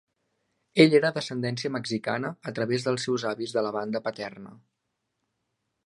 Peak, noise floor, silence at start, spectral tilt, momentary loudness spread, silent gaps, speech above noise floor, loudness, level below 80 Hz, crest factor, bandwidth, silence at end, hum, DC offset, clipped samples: -4 dBFS; -80 dBFS; 0.75 s; -5.5 dB/octave; 14 LU; none; 54 dB; -26 LUFS; -72 dBFS; 24 dB; 11.5 kHz; 1.3 s; none; under 0.1%; under 0.1%